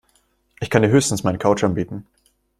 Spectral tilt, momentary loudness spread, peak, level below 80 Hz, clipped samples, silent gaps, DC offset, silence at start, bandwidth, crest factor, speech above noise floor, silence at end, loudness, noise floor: -5.5 dB/octave; 15 LU; -2 dBFS; -50 dBFS; under 0.1%; none; under 0.1%; 0.6 s; 14.5 kHz; 20 dB; 44 dB; 0.6 s; -19 LUFS; -63 dBFS